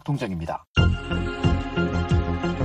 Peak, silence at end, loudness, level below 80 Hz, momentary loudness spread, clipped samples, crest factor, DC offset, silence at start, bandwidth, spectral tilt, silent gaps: -4 dBFS; 0 s; -25 LUFS; -32 dBFS; 6 LU; under 0.1%; 18 dB; under 0.1%; 0.05 s; 8.6 kHz; -7 dB/octave; 0.67-0.74 s